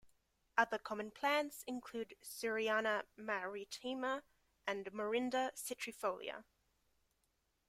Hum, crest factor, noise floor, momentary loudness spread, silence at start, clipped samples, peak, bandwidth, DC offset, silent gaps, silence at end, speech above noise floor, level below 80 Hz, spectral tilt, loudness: none; 24 dB; -82 dBFS; 10 LU; 0.05 s; under 0.1%; -18 dBFS; 16 kHz; under 0.1%; none; 1.25 s; 42 dB; -80 dBFS; -2.5 dB/octave; -41 LUFS